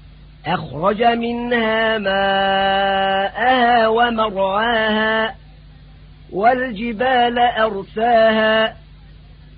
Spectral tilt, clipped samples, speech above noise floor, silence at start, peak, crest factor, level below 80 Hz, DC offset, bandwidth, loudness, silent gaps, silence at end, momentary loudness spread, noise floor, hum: -9.5 dB/octave; under 0.1%; 25 dB; 0.05 s; -4 dBFS; 14 dB; -44 dBFS; under 0.1%; 5 kHz; -17 LUFS; none; 0.25 s; 7 LU; -42 dBFS; none